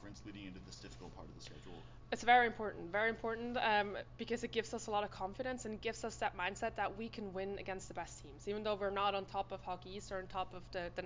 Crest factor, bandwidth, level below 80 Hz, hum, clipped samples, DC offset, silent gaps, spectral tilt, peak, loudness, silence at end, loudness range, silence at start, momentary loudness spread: 24 dB; 7.6 kHz; -60 dBFS; none; under 0.1%; under 0.1%; none; -4 dB/octave; -16 dBFS; -39 LUFS; 0 s; 6 LU; 0 s; 18 LU